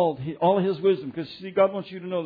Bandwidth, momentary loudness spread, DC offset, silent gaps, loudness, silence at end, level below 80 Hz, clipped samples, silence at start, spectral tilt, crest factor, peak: 5 kHz; 12 LU; under 0.1%; none; -25 LUFS; 0 s; -66 dBFS; under 0.1%; 0 s; -9.5 dB/octave; 16 dB; -8 dBFS